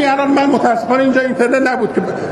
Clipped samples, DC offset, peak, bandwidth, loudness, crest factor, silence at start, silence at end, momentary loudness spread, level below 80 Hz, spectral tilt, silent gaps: under 0.1%; under 0.1%; 0 dBFS; 11.5 kHz; -14 LUFS; 14 dB; 0 s; 0 s; 4 LU; -56 dBFS; -5.5 dB/octave; none